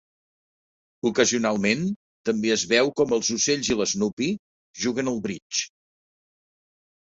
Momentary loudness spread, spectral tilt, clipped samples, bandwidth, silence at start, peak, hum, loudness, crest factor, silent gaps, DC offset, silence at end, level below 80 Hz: 9 LU; -3 dB/octave; under 0.1%; 8 kHz; 1.05 s; -6 dBFS; none; -24 LUFS; 20 dB; 1.96-2.24 s, 4.13-4.17 s, 4.39-4.74 s, 5.42-5.50 s; under 0.1%; 1.4 s; -60 dBFS